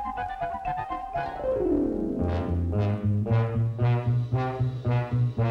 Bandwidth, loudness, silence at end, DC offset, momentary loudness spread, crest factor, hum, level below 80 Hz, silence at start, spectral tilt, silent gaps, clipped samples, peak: 5.2 kHz; -27 LUFS; 0 s; under 0.1%; 7 LU; 12 dB; none; -44 dBFS; 0 s; -10 dB/octave; none; under 0.1%; -14 dBFS